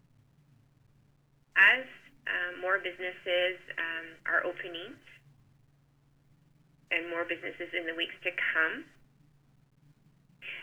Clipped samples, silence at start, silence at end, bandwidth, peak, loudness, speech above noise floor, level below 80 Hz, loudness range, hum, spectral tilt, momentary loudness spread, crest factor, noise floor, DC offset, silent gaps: under 0.1%; 1.55 s; 0 s; over 20 kHz; -8 dBFS; -30 LUFS; 32 dB; -74 dBFS; 9 LU; none; -3.5 dB/octave; 19 LU; 26 dB; -67 dBFS; under 0.1%; none